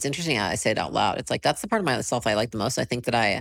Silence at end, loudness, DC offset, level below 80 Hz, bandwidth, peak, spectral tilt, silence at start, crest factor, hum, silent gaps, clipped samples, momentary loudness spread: 0 s; -25 LUFS; under 0.1%; -52 dBFS; 17 kHz; -8 dBFS; -4 dB/octave; 0 s; 16 dB; none; none; under 0.1%; 3 LU